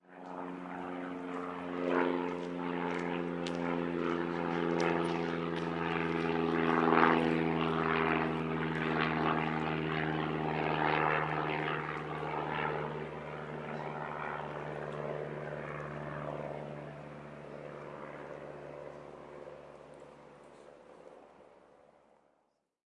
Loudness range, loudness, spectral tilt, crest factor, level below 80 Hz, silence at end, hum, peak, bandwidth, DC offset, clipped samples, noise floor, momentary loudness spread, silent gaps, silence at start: 17 LU; -34 LUFS; -7 dB/octave; 26 dB; -66 dBFS; 1.45 s; none; -8 dBFS; 10.5 kHz; under 0.1%; under 0.1%; -78 dBFS; 17 LU; none; 0.1 s